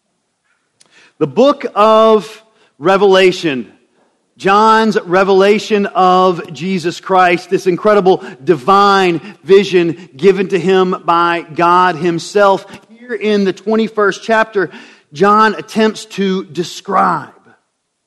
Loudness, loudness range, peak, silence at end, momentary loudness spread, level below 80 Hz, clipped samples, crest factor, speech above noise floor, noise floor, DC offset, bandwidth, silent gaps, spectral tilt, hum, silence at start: -12 LUFS; 3 LU; 0 dBFS; 0.8 s; 10 LU; -56 dBFS; 0.2%; 12 dB; 53 dB; -65 dBFS; under 0.1%; 12 kHz; none; -5.5 dB/octave; none; 1.2 s